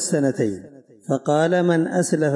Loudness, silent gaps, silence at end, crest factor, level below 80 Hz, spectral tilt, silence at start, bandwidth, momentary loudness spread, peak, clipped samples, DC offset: -21 LUFS; none; 0 s; 14 dB; -68 dBFS; -5.5 dB/octave; 0 s; 11.5 kHz; 10 LU; -8 dBFS; under 0.1%; under 0.1%